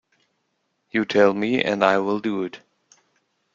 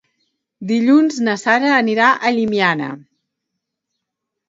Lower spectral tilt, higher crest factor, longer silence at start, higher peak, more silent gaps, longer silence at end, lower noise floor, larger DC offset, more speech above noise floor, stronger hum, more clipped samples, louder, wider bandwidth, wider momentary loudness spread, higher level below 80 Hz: about the same, -6 dB/octave vs -5 dB/octave; about the same, 20 dB vs 18 dB; first, 0.95 s vs 0.6 s; about the same, -2 dBFS vs 0 dBFS; neither; second, 0.95 s vs 1.5 s; second, -73 dBFS vs -79 dBFS; neither; second, 52 dB vs 64 dB; neither; neither; second, -21 LUFS vs -15 LUFS; about the same, 7.6 kHz vs 7.8 kHz; about the same, 10 LU vs 12 LU; about the same, -66 dBFS vs -66 dBFS